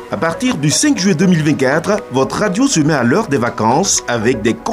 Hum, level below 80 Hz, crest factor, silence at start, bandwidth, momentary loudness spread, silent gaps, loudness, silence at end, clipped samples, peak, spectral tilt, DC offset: none; -44 dBFS; 12 dB; 0 s; 15.5 kHz; 4 LU; none; -14 LUFS; 0 s; under 0.1%; -2 dBFS; -4.5 dB/octave; under 0.1%